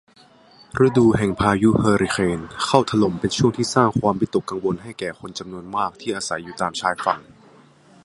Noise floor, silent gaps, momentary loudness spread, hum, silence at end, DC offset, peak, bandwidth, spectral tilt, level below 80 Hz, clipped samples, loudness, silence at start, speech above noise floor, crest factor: -51 dBFS; none; 12 LU; none; 0.8 s; under 0.1%; 0 dBFS; 11.5 kHz; -5.5 dB/octave; -46 dBFS; under 0.1%; -20 LUFS; 0.75 s; 31 dB; 20 dB